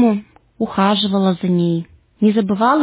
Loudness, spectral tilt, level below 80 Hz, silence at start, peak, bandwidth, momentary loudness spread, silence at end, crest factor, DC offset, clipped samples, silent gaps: -17 LUFS; -11 dB/octave; -54 dBFS; 0 s; -2 dBFS; 4 kHz; 8 LU; 0 s; 14 dB; under 0.1%; under 0.1%; none